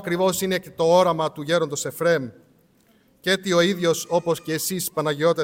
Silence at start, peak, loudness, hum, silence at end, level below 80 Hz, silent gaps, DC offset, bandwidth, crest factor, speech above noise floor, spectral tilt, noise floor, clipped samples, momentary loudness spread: 0 s; -6 dBFS; -22 LUFS; none; 0 s; -64 dBFS; none; under 0.1%; 17 kHz; 16 dB; 37 dB; -4 dB/octave; -59 dBFS; under 0.1%; 7 LU